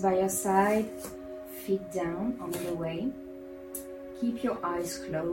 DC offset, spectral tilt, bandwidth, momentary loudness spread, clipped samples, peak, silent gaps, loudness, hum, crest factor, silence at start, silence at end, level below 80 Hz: under 0.1%; -5 dB/octave; 17 kHz; 16 LU; under 0.1%; -12 dBFS; none; -31 LUFS; none; 18 dB; 0 s; 0 s; -60 dBFS